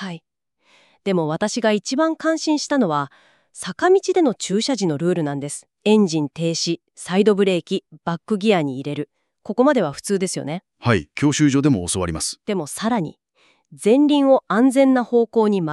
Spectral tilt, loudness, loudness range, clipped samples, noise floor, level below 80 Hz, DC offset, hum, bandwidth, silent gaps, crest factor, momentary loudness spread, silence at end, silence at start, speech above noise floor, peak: -5 dB/octave; -20 LUFS; 3 LU; under 0.1%; -60 dBFS; -54 dBFS; under 0.1%; none; 12.5 kHz; none; 16 dB; 12 LU; 0 s; 0 s; 41 dB; -4 dBFS